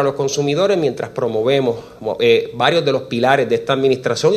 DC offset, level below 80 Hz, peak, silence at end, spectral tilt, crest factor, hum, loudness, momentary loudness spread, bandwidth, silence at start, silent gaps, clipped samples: under 0.1%; -56 dBFS; 0 dBFS; 0 s; -5 dB/octave; 16 dB; none; -17 LUFS; 6 LU; 13.5 kHz; 0 s; none; under 0.1%